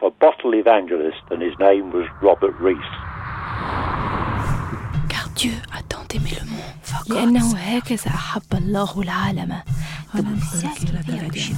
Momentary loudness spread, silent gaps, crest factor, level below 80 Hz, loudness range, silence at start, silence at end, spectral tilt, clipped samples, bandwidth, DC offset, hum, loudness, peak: 13 LU; none; 18 dB; -34 dBFS; 5 LU; 0 s; 0 s; -5.5 dB/octave; under 0.1%; 16.5 kHz; under 0.1%; none; -21 LUFS; -2 dBFS